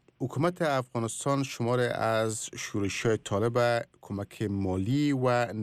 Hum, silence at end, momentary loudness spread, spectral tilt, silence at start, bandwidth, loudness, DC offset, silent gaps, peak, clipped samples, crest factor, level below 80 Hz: none; 0 s; 8 LU; -5.5 dB/octave; 0.2 s; 15 kHz; -29 LUFS; under 0.1%; none; -16 dBFS; under 0.1%; 14 dB; -64 dBFS